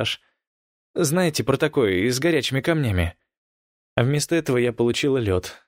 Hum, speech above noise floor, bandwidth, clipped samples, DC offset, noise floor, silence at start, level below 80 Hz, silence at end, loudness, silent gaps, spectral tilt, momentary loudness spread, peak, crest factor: none; over 69 dB; 16 kHz; under 0.1%; under 0.1%; under -90 dBFS; 0 s; -46 dBFS; 0.15 s; -22 LUFS; 0.47-0.94 s, 3.37-3.96 s; -5 dB/octave; 6 LU; -4 dBFS; 20 dB